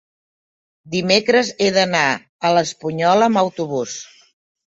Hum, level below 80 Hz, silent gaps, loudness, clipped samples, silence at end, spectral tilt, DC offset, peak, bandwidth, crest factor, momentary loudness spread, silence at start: none; -62 dBFS; 2.29-2.39 s; -17 LUFS; under 0.1%; 0.65 s; -4 dB/octave; under 0.1%; -2 dBFS; 8 kHz; 18 dB; 10 LU; 0.85 s